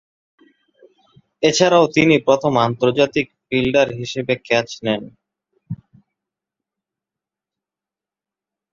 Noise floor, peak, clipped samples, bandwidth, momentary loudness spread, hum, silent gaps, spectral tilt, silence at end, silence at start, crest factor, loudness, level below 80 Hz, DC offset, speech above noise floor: -89 dBFS; -2 dBFS; under 0.1%; 7.8 kHz; 12 LU; none; none; -5 dB/octave; 2.95 s; 1.4 s; 20 dB; -17 LUFS; -54 dBFS; under 0.1%; 72 dB